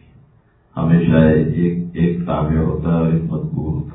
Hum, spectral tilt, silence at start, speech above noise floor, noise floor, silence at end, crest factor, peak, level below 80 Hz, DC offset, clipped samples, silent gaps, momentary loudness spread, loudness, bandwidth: none; -13 dB/octave; 0.75 s; 37 dB; -53 dBFS; 0 s; 16 dB; 0 dBFS; -34 dBFS; under 0.1%; under 0.1%; none; 10 LU; -17 LUFS; 3.9 kHz